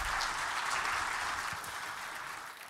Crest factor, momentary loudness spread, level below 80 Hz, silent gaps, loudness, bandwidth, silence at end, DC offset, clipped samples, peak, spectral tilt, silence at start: 18 dB; 8 LU; -56 dBFS; none; -35 LUFS; 16 kHz; 0 s; under 0.1%; under 0.1%; -18 dBFS; -0.5 dB/octave; 0 s